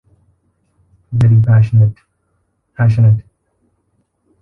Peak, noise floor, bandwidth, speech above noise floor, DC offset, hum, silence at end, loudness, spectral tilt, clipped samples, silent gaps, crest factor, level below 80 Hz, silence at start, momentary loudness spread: -2 dBFS; -64 dBFS; 3 kHz; 54 dB; under 0.1%; none; 1.2 s; -13 LUFS; -10 dB/octave; under 0.1%; none; 12 dB; -40 dBFS; 1.1 s; 7 LU